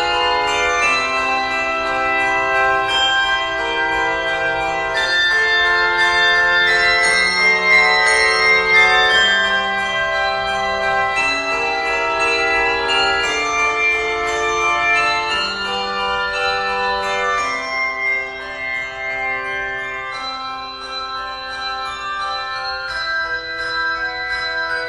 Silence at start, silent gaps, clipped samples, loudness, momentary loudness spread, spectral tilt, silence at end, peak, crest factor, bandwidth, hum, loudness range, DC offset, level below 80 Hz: 0 s; none; under 0.1%; -16 LUFS; 11 LU; -1.5 dB/octave; 0 s; -2 dBFS; 16 dB; 12.5 kHz; none; 11 LU; under 0.1%; -44 dBFS